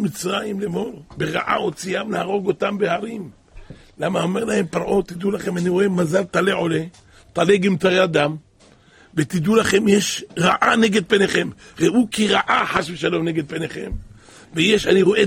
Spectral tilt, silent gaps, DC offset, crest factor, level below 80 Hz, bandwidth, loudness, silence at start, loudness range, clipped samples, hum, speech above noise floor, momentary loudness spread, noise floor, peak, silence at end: -5 dB/octave; none; under 0.1%; 18 dB; -46 dBFS; 16 kHz; -19 LUFS; 0 s; 6 LU; under 0.1%; none; 32 dB; 12 LU; -51 dBFS; -2 dBFS; 0 s